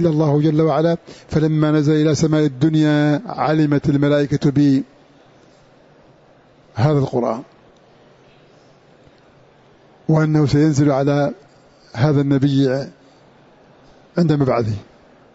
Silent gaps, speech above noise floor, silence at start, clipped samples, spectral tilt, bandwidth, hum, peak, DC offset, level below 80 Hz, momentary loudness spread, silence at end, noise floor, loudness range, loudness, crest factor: none; 34 dB; 0 s; under 0.1%; -7.5 dB/octave; 8 kHz; none; -4 dBFS; under 0.1%; -50 dBFS; 10 LU; 0.55 s; -50 dBFS; 8 LU; -17 LUFS; 14 dB